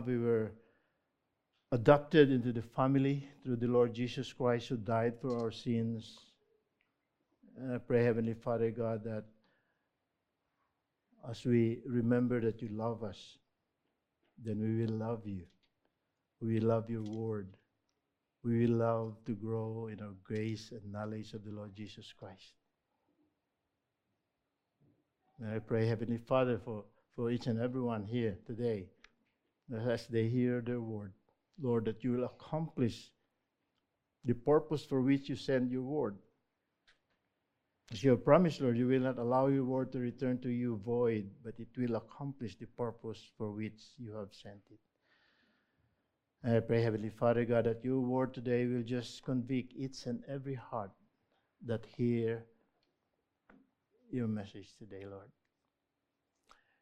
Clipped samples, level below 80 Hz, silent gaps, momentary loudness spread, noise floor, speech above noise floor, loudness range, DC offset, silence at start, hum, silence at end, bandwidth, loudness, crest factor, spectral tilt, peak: under 0.1%; -68 dBFS; none; 16 LU; -86 dBFS; 52 dB; 13 LU; under 0.1%; 0 s; none; 1.55 s; 9.2 kHz; -35 LUFS; 26 dB; -8 dB/octave; -10 dBFS